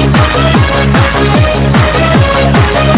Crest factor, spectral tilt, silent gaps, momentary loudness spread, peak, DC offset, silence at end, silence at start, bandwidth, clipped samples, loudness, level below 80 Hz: 8 dB; -10.5 dB/octave; none; 1 LU; 0 dBFS; under 0.1%; 0 s; 0 s; 4 kHz; under 0.1%; -8 LUFS; -16 dBFS